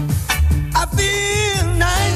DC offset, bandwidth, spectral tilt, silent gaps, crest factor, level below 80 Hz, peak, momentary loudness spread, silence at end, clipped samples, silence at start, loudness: under 0.1%; 15.5 kHz; -4 dB/octave; none; 12 dB; -22 dBFS; -4 dBFS; 2 LU; 0 s; under 0.1%; 0 s; -17 LUFS